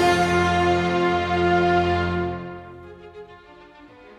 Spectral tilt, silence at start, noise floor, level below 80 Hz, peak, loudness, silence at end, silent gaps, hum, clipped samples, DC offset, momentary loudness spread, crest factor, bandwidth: -6 dB/octave; 0 s; -46 dBFS; -44 dBFS; -6 dBFS; -20 LUFS; 0.3 s; none; none; under 0.1%; under 0.1%; 23 LU; 16 dB; 12.5 kHz